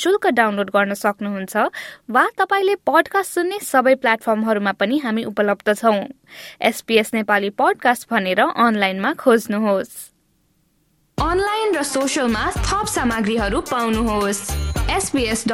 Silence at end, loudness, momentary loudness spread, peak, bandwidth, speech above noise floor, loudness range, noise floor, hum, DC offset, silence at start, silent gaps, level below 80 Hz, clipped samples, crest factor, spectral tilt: 0 s; -19 LUFS; 7 LU; -2 dBFS; 17 kHz; 44 dB; 3 LU; -62 dBFS; none; under 0.1%; 0 s; none; -36 dBFS; under 0.1%; 18 dB; -4 dB/octave